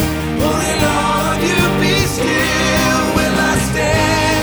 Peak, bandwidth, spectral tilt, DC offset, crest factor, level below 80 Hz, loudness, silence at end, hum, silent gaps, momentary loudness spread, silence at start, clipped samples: 0 dBFS; over 20 kHz; -4 dB/octave; under 0.1%; 14 dB; -28 dBFS; -14 LUFS; 0 s; none; none; 2 LU; 0 s; under 0.1%